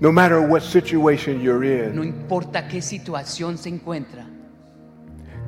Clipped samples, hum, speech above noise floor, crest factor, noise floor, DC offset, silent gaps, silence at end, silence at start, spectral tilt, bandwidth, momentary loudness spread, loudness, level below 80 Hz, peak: under 0.1%; none; 27 dB; 20 dB; -46 dBFS; under 0.1%; none; 0 s; 0 s; -6 dB/octave; 16.5 kHz; 15 LU; -20 LUFS; -54 dBFS; -2 dBFS